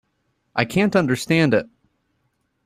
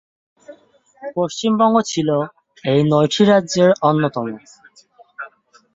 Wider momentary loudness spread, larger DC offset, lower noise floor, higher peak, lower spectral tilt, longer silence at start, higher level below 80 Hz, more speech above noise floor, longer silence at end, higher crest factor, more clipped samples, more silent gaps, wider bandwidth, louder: second, 6 LU vs 21 LU; neither; first, -70 dBFS vs -52 dBFS; about the same, -2 dBFS vs -2 dBFS; about the same, -6 dB/octave vs -5.5 dB/octave; about the same, 0.55 s vs 0.5 s; about the same, -56 dBFS vs -60 dBFS; first, 51 dB vs 35 dB; first, 1 s vs 0.45 s; about the same, 20 dB vs 18 dB; neither; neither; first, 15.5 kHz vs 7.8 kHz; second, -20 LUFS vs -17 LUFS